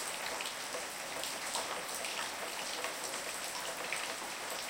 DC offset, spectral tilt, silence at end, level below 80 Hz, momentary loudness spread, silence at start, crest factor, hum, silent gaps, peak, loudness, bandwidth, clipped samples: under 0.1%; 0 dB/octave; 0 s; -72 dBFS; 2 LU; 0 s; 22 dB; none; none; -18 dBFS; -38 LUFS; 17 kHz; under 0.1%